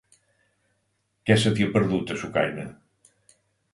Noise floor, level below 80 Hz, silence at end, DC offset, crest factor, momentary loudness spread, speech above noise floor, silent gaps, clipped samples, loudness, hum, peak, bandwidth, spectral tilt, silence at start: -73 dBFS; -56 dBFS; 1 s; under 0.1%; 22 dB; 13 LU; 50 dB; none; under 0.1%; -24 LUFS; none; -4 dBFS; 11.5 kHz; -6 dB/octave; 1.25 s